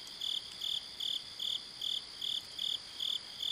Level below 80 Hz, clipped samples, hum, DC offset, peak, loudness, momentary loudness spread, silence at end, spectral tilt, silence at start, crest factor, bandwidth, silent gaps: -72 dBFS; under 0.1%; none; under 0.1%; -26 dBFS; -36 LUFS; 1 LU; 0 s; 0.5 dB/octave; 0 s; 14 dB; 15.5 kHz; none